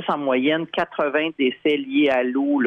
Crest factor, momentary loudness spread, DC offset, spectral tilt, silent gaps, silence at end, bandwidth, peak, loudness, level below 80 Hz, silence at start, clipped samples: 12 dB; 4 LU; under 0.1%; -7 dB/octave; none; 0 s; 5 kHz; -10 dBFS; -21 LUFS; -66 dBFS; 0 s; under 0.1%